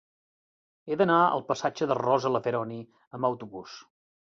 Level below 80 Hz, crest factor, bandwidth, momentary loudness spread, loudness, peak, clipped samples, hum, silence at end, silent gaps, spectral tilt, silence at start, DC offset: -72 dBFS; 20 dB; 7.6 kHz; 20 LU; -27 LUFS; -8 dBFS; under 0.1%; none; 0.4 s; 3.07-3.11 s; -6 dB/octave; 0.85 s; under 0.1%